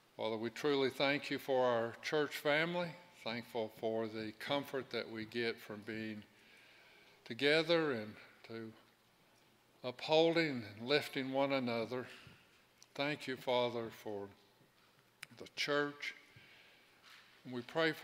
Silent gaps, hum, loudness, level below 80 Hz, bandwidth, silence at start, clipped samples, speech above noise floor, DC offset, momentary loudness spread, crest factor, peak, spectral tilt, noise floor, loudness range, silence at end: none; none; -38 LUFS; -84 dBFS; 16 kHz; 0.2 s; under 0.1%; 32 dB; under 0.1%; 17 LU; 22 dB; -18 dBFS; -5 dB/octave; -70 dBFS; 7 LU; 0 s